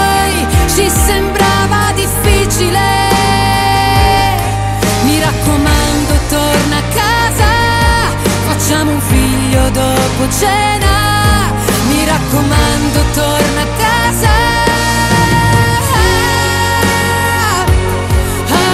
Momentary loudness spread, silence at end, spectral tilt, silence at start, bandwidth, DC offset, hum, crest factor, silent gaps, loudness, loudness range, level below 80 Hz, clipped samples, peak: 3 LU; 0 s; -4 dB/octave; 0 s; 16.5 kHz; 0.2%; none; 10 dB; none; -11 LUFS; 1 LU; -18 dBFS; under 0.1%; 0 dBFS